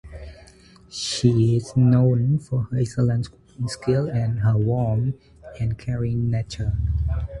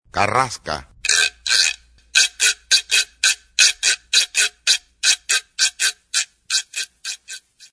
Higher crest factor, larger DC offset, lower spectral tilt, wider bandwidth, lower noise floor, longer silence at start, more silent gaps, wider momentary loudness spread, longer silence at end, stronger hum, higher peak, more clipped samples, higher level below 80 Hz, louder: about the same, 18 dB vs 20 dB; neither; first, -7 dB/octave vs 1 dB/octave; about the same, 11.5 kHz vs 11 kHz; first, -49 dBFS vs -39 dBFS; about the same, 0.05 s vs 0.15 s; neither; about the same, 12 LU vs 13 LU; second, 0 s vs 0.35 s; neither; second, -4 dBFS vs 0 dBFS; neither; first, -36 dBFS vs -54 dBFS; second, -22 LUFS vs -17 LUFS